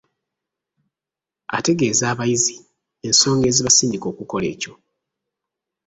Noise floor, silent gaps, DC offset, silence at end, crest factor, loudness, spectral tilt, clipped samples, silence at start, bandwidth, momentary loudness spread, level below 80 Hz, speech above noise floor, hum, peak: -88 dBFS; none; under 0.1%; 1.15 s; 20 dB; -17 LUFS; -3 dB/octave; under 0.1%; 1.5 s; 8.4 kHz; 14 LU; -54 dBFS; 69 dB; none; -2 dBFS